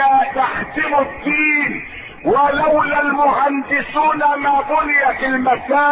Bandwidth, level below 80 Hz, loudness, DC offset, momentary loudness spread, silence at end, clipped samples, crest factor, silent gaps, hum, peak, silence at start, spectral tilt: 4.9 kHz; -44 dBFS; -16 LUFS; under 0.1%; 5 LU; 0 s; under 0.1%; 12 dB; none; none; -4 dBFS; 0 s; -9.5 dB/octave